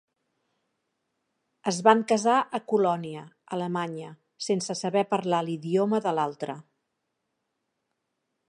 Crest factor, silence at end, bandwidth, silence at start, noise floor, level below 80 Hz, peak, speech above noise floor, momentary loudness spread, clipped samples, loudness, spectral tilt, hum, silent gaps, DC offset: 24 dB; 1.9 s; 11.5 kHz; 1.65 s; -80 dBFS; -80 dBFS; -4 dBFS; 54 dB; 15 LU; under 0.1%; -26 LUFS; -5 dB/octave; none; none; under 0.1%